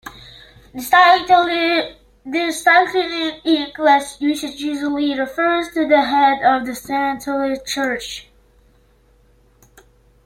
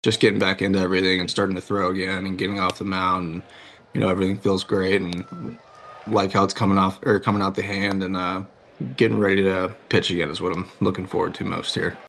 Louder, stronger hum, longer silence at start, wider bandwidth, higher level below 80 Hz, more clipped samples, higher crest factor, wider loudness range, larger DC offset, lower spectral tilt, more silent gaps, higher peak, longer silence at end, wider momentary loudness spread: first, -17 LUFS vs -22 LUFS; neither; about the same, 0.05 s vs 0.05 s; first, 16.5 kHz vs 12 kHz; about the same, -52 dBFS vs -56 dBFS; neither; about the same, 18 dB vs 18 dB; first, 8 LU vs 2 LU; neither; second, -2.5 dB/octave vs -5.5 dB/octave; neither; about the same, -2 dBFS vs -4 dBFS; first, 2.05 s vs 0 s; about the same, 12 LU vs 12 LU